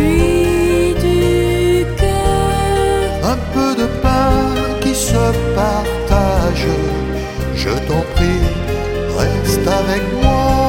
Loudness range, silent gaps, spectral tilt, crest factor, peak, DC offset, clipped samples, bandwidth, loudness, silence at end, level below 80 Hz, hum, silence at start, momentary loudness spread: 2 LU; none; -5.5 dB/octave; 14 dB; 0 dBFS; under 0.1%; under 0.1%; 17 kHz; -15 LUFS; 0 s; -20 dBFS; none; 0 s; 5 LU